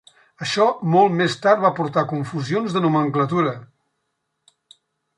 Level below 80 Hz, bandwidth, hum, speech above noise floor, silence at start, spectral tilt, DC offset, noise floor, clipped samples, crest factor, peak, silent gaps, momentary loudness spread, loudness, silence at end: -66 dBFS; 11 kHz; none; 56 dB; 0.4 s; -6 dB/octave; under 0.1%; -75 dBFS; under 0.1%; 18 dB; -4 dBFS; none; 8 LU; -20 LUFS; 1.55 s